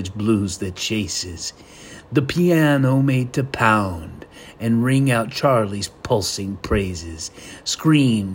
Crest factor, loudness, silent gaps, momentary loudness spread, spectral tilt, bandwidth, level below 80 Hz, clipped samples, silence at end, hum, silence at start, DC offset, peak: 20 dB; -20 LUFS; none; 15 LU; -5.5 dB/octave; 16.5 kHz; -44 dBFS; under 0.1%; 0 s; none; 0 s; under 0.1%; 0 dBFS